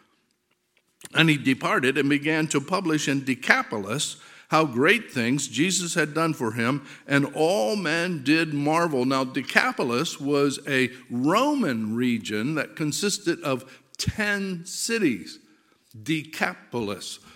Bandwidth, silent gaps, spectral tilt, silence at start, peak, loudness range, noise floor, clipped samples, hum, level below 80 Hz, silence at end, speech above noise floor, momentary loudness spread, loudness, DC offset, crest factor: 16.5 kHz; none; -4 dB/octave; 1.05 s; 0 dBFS; 4 LU; -71 dBFS; under 0.1%; none; -60 dBFS; 0.2 s; 47 dB; 8 LU; -24 LUFS; under 0.1%; 24 dB